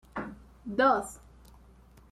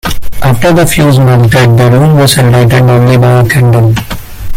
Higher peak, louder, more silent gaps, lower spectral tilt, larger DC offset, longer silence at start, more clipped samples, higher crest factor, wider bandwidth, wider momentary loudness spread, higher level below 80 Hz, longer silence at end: second, -12 dBFS vs 0 dBFS; second, -28 LUFS vs -6 LUFS; neither; second, -4.5 dB/octave vs -6 dB/octave; neither; about the same, 0.15 s vs 0.05 s; second, under 0.1% vs 0.2%; first, 20 dB vs 6 dB; second, 14 kHz vs 16.5 kHz; first, 21 LU vs 8 LU; second, -56 dBFS vs -24 dBFS; first, 0.95 s vs 0 s